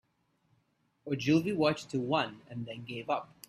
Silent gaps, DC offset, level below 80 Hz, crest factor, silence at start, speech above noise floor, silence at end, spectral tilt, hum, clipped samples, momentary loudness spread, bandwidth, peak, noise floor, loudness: none; under 0.1%; -70 dBFS; 20 dB; 1.05 s; 43 dB; 0.25 s; -6 dB/octave; none; under 0.1%; 13 LU; 13.5 kHz; -14 dBFS; -75 dBFS; -32 LUFS